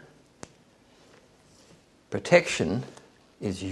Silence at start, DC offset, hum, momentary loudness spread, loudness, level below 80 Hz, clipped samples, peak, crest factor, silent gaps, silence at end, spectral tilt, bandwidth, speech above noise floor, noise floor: 2.1 s; under 0.1%; none; 27 LU; -26 LUFS; -64 dBFS; under 0.1%; -4 dBFS; 26 dB; none; 0 s; -5 dB/octave; 12 kHz; 33 dB; -59 dBFS